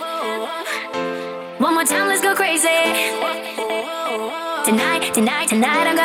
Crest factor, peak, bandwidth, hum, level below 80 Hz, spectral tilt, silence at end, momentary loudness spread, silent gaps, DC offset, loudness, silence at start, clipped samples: 18 dB; -2 dBFS; 18.5 kHz; none; -66 dBFS; -2 dB/octave; 0 s; 9 LU; none; under 0.1%; -19 LUFS; 0 s; under 0.1%